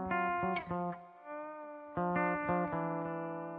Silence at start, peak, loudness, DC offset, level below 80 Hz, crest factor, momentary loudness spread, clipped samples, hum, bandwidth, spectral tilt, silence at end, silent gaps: 0 s; -22 dBFS; -36 LUFS; under 0.1%; -66 dBFS; 16 dB; 13 LU; under 0.1%; none; 4.7 kHz; -10 dB/octave; 0 s; none